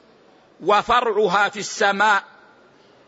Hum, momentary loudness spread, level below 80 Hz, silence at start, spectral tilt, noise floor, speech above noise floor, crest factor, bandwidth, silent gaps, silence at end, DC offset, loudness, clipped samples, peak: none; 5 LU; -56 dBFS; 0.6 s; -2.5 dB/octave; -53 dBFS; 34 dB; 16 dB; 8 kHz; none; 0.85 s; under 0.1%; -19 LUFS; under 0.1%; -4 dBFS